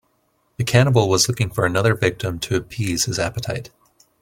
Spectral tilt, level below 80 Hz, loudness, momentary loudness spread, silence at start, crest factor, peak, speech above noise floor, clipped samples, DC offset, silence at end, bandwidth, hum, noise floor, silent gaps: -4.5 dB/octave; -46 dBFS; -20 LUFS; 11 LU; 0.6 s; 20 dB; -2 dBFS; 46 dB; under 0.1%; under 0.1%; 0.55 s; 16.5 kHz; none; -65 dBFS; none